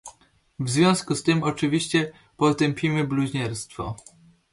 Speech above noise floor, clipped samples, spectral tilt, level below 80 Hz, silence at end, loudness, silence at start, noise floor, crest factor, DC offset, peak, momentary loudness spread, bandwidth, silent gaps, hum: 33 dB; under 0.1%; -5 dB/octave; -54 dBFS; 0.55 s; -24 LUFS; 0.05 s; -56 dBFS; 20 dB; under 0.1%; -6 dBFS; 13 LU; 11.5 kHz; none; none